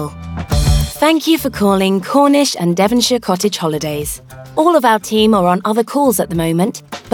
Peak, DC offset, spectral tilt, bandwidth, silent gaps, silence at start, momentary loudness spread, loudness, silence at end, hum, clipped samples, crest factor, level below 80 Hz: 0 dBFS; under 0.1%; -5 dB/octave; 19 kHz; none; 0 s; 9 LU; -14 LUFS; 0.05 s; none; under 0.1%; 14 dB; -28 dBFS